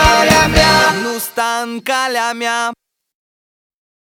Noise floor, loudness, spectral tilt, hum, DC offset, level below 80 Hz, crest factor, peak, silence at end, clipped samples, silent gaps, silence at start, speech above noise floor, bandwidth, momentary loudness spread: under -90 dBFS; -13 LUFS; -3 dB/octave; none; under 0.1%; -30 dBFS; 16 dB; 0 dBFS; 1.25 s; under 0.1%; none; 0 s; over 72 dB; over 20 kHz; 10 LU